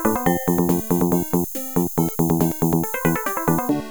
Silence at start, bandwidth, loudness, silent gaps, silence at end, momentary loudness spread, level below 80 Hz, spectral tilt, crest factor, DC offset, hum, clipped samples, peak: 0 s; over 20 kHz; -21 LUFS; none; 0 s; 3 LU; -42 dBFS; -6.5 dB/octave; 16 dB; under 0.1%; none; under 0.1%; -4 dBFS